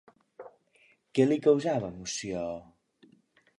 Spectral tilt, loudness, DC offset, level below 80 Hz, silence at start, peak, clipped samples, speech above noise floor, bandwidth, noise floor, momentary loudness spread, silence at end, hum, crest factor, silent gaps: -5.5 dB/octave; -29 LUFS; under 0.1%; -64 dBFS; 0.4 s; -10 dBFS; under 0.1%; 38 dB; 11 kHz; -65 dBFS; 26 LU; 1 s; none; 20 dB; none